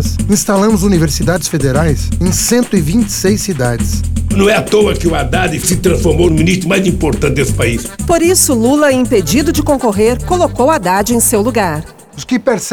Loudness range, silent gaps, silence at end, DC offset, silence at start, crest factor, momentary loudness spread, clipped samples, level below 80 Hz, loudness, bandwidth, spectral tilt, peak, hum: 2 LU; none; 0 s; 0.6%; 0 s; 12 dB; 5 LU; under 0.1%; -24 dBFS; -12 LUFS; over 20 kHz; -5 dB/octave; 0 dBFS; none